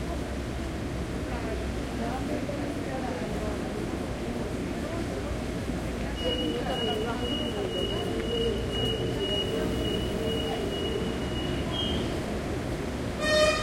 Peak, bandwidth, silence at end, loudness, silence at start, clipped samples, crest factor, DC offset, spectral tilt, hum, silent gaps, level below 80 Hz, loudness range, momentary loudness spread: -12 dBFS; 16.5 kHz; 0 s; -30 LUFS; 0 s; under 0.1%; 18 dB; under 0.1%; -5 dB/octave; none; none; -40 dBFS; 3 LU; 5 LU